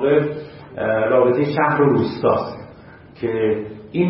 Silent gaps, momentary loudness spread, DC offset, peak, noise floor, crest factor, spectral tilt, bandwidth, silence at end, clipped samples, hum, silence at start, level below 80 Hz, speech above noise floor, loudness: none; 14 LU; under 0.1%; -2 dBFS; -42 dBFS; 16 dB; -12 dB/octave; 5.8 kHz; 0 s; under 0.1%; none; 0 s; -54 dBFS; 25 dB; -19 LUFS